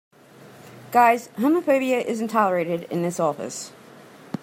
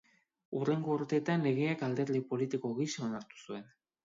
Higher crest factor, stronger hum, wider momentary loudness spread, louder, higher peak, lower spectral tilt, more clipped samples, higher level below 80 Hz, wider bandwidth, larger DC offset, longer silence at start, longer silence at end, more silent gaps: about the same, 20 dB vs 16 dB; neither; about the same, 14 LU vs 14 LU; first, -22 LUFS vs -34 LUFS; first, -4 dBFS vs -18 dBFS; about the same, -5.5 dB/octave vs -6.5 dB/octave; neither; first, -74 dBFS vs -80 dBFS; first, 16 kHz vs 7.8 kHz; neither; about the same, 0.4 s vs 0.5 s; second, 0.05 s vs 0.4 s; neither